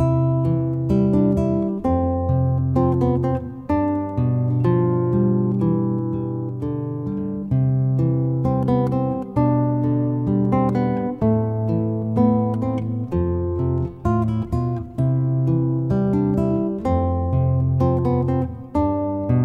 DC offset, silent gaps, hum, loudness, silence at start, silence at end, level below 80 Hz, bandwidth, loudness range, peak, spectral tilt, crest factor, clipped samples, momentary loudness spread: under 0.1%; none; none; -21 LUFS; 0 s; 0 s; -38 dBFS; 3.6 kHz; 2 LU; -6 dBFS; -11.5 dB/octave; 14 dB; under 0.1%; 5 LU